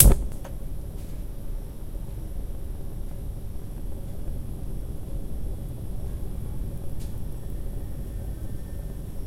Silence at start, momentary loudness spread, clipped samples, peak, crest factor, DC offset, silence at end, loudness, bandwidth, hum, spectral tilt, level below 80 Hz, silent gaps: 0 s; 3 LU; under 0.1%; 0 dBFS; 28 dB; under 0.1%; 0 s; -34 LUFS; 16 kHz; none; -5.5 dB/octave; -30 dBFS; none